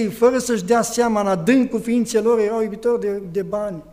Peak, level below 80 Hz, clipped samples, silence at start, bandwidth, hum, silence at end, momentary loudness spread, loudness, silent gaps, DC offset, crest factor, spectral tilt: -4 dBFS; -52 dBFS; under 0.1%; 0 s; 16 kHz; none; 0.1 s; 7 LU; -19 LUFS; none; under 0.1%; 16 dB; -5 dB/octave